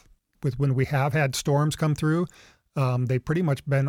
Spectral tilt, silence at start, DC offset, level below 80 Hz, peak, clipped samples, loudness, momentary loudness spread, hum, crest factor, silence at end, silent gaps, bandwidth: -6.5 dB/octave; 0.4 s; under 0.1%; -52 dBFS; -12 dBFS; under 0.1%; -25 LUFS; 7 LU; none; 12 dB; 0 s; none; 16 kHz